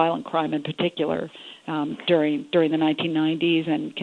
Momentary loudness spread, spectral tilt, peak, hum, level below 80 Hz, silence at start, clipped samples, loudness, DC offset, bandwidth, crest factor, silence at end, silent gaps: 8 LU; -7.5 dB/octave; -6 dBFS; none; -68 dBFS; 0 s; under 0.1%; -24 LUFS; under 0.1%; 4.5 kHz; 18 dB; 0 s; none